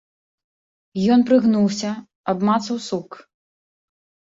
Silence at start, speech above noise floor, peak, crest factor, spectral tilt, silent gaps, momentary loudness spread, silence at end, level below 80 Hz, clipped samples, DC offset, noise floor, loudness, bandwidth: 0.95 s; over 71 dB; -4 dBFS; 16 dB; -6 dB/octave; 2.15-2.24 s; 14 LU; 1.2 s; -64 dBFS; under 0.1%; under 0.1%; under -90 dBFS; -20 LUFS; 8 kHz